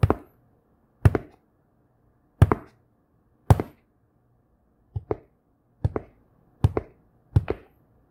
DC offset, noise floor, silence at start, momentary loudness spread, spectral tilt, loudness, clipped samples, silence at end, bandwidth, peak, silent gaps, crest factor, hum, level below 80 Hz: under 0.1%; -66 dBFS; 0.05 s; 13 LU; -8.5 dB/octave; -26 LUFS; under 0.1%; 0.55 s; 16 kHz; 0 dBFS; none; 26 dB; none; -38 dBFS